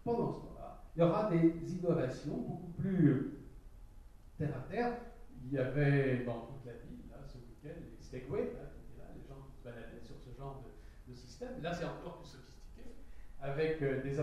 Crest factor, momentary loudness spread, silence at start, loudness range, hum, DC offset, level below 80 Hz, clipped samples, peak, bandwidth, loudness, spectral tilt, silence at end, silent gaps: 22 dB; 23 LU; 0 s; 13 LU; none; under 0.1%; -54 dBFS; under 0.1%; -16 dBFS; 10.5 kHz; -36 LUFS; -8.5 dB/octave; 0 s; none